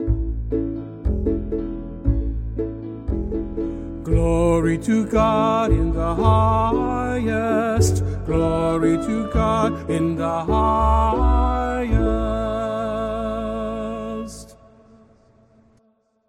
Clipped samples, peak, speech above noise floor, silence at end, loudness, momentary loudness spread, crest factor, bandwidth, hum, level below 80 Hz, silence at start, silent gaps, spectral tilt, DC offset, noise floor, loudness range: under 0.1%; -4 dBFS; 44 dB; 1.75 s; -21 LUFS; 10 LU; 18 dB; 13.5 kHz; none; -26 dBFS; 0 s; none; -7 dB/octave; under 0.1%; -63 dBFS; 7 LU